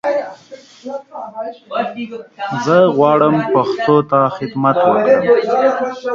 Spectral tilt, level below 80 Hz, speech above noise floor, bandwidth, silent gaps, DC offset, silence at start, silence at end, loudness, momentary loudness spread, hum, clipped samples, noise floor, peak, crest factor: -7 dB/octave; -60 dBFS; 25 dB; 7.4 kHz; none; under 0.1%; 0.05 s; 0 s; -14 LUFS; 17 LU; none; under 0.1%; -39 dBFS; 0 dBFS; 14 dB